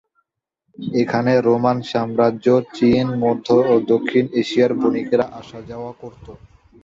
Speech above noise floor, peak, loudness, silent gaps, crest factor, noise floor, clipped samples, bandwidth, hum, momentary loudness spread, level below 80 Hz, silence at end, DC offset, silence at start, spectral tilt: 55 dB; -2 dBFS; -18 LUFS; none; 16 dB; -73 dBFS; under 0.1%; 7.6 kHz; none; 16 LU; -54 dBFS; 0.5 s; under 0.1%; 0.8 s; -7.5 dB/octave